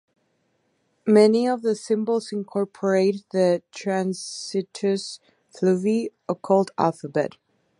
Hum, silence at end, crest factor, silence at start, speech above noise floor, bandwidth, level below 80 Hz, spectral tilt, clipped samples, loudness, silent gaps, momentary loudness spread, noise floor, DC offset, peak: none; 0.5 s; 20 dB; 1.05 s; 47 dB; 11.5 kHz; -74 dBFS; -6 dB/octave; under 0.1%; -23 LUFS; none; 11 LU; -69 dBFS; under 0.1%; -4 dBFS